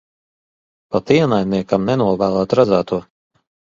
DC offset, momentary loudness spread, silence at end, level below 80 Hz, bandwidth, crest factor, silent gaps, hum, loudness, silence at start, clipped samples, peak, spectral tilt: under 0.1%; 9 LU; 0.75 s; -50 dBFS; 7.6 kHz; 18 dB; none; none; -17 LUFS; 0.9 s; under 0.1%; 0 dBFS; -7.5 dB/octave